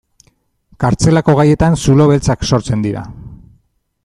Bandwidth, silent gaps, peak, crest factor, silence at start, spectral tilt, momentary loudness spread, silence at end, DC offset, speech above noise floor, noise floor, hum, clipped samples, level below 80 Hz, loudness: 11.5 kHz; none; 0 dBFS; 12 dB; 0.8 s; -6.5 dB/octave; 10 LU; 0.7 s; under 0.1%; 46 dB; -58 dBFS; none; under 0.1%; -32 dBFS; -12 LUFS